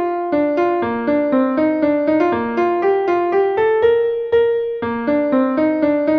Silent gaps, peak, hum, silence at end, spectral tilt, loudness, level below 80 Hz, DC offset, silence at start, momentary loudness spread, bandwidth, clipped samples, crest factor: none; -4 dBFS; none; 0 s; -8 dB/octave; -17 LUFS; -52 dBFS; under 0.1%; 0 s; 3 LU; 6.2 kHz; under 0.1%; 12 dB